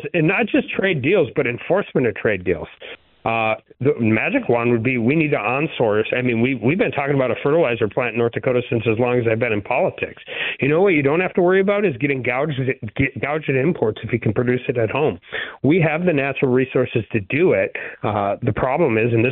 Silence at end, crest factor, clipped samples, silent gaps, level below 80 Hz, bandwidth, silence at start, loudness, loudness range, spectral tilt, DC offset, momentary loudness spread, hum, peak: 0 s; 14 dB; under 0.1%; none; -50 dBFS; 4.1 kHz; 0 s; -19 LUFS; 2 LU; -12 dB/octave; under 0.1%; 6 LU; none; -6 dBFS